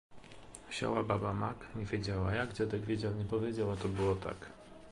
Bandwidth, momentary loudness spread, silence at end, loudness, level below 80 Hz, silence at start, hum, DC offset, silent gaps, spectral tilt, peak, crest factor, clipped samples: 11.5 kHz; 16 LU; 0 s; -36 LUFS; -54 dBFS; 0.1 s; none; under 0.1%; none; -6.5 dB/octave; -18 dBFS; 20 dB; under 0.1%